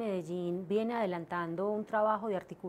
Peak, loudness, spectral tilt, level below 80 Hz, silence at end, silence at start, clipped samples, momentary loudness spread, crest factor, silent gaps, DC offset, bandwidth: -20 dBFS; -34 LUFS; -7.5 dB/octave; -76 dBFS; 0 s; 0 s; under 0.1%; 6 LU; 14 dB; none; under 0.1%; 15 kHz